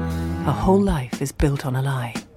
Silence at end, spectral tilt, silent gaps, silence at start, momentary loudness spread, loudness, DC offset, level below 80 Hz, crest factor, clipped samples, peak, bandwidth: 0.1 s; -7 dB/octave; none; 0 s; 8 LU; -22 LUFS; under 0.1%; -32 dBFS; 18 dB; under 0.1%; -4 dBFS; 16 kHz